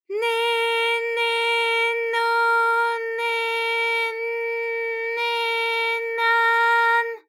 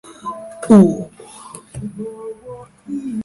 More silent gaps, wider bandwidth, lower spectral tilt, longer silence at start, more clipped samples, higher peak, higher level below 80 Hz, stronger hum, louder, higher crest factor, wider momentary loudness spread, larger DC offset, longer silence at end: neither; first, 18 kHz vs 11.5 kHz; second, 3 dB/octave vs -8 dB/octave; about the same, 0.1 s vs 0.05 s; neither; second, -10 dBFS vs 0 dBFS; second, under -90 dBFS vs -52 dBFS; neither; second, -21 LUFS vs -14 LUFS; second, 12 dB vs 18 dB; second, 7 LU vs 26 LU; neither; about the same, 0.1 s vs 0 s